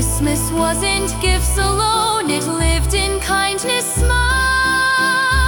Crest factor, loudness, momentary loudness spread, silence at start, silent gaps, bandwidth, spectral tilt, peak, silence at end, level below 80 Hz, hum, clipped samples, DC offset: 14 dB; -16 LUFS; 3 LU; 0 s; none; 18 kHz; -3 dB/octave; -2 dBFS; 0 s; -22 dBFS; none; under 0.1%; under 0.1%